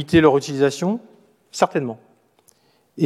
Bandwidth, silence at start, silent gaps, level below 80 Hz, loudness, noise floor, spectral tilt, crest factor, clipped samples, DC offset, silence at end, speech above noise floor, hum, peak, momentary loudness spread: 13.5 kHz; 0 s; none; -54 dBFS; -20 LUFS; -59 dBFS; -6 dB/octave; 18 dB; under 0.1%; under 0.1%; 0 s; 40 dB; none; -2 dBFS; 17 LU